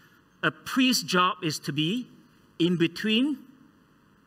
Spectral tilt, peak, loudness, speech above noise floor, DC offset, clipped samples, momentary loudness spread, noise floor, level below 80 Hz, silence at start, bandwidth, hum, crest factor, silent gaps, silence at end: -4 dB/octave; -8 dBFS; -26 LUFS; 35 dB; under 0.1%; under 0.1%; 8 LU; -60 dBFS; -72 dBFS; 0.45 s; 16 kHz; none; 20 dB; none; 0.85 s